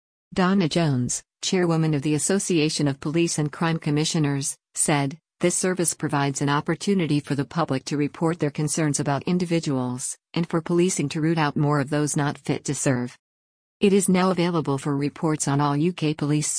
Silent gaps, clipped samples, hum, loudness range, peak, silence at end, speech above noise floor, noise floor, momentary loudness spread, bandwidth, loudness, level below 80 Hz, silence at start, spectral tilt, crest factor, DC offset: 13.19-13.80 s; under 0.1%; none; 1 LU; -8 dBFS; 0 s; over 67 dB; under -90 dBFS; 5 LU; 10.5 kHz; -23 LUFS; -58 dBFS; 0.3 s; -5 dB/octave; 16 dB; under 0.1%